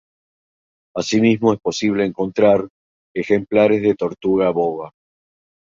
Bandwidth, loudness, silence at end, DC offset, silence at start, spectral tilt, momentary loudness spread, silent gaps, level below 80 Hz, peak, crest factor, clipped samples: 7.6 kHz; -18 LUFS; 0.8 s; under 0.1%; 0.95 s; -6 dB/octave; 14 LU; 2.70-3.15 s; -56 dBFS; -2 dBFS; 18 dB; under 0.1%